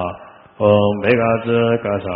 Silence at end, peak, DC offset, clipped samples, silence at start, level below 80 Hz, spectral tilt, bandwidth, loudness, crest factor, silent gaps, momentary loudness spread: 0 s; 0 dBFS; under 0.1%; under 0.1%; 0 s; -50 dBFS; -5.5 dB/octave; 5.2 kHz; -16 LUFS; 16 dB; none; 5 LU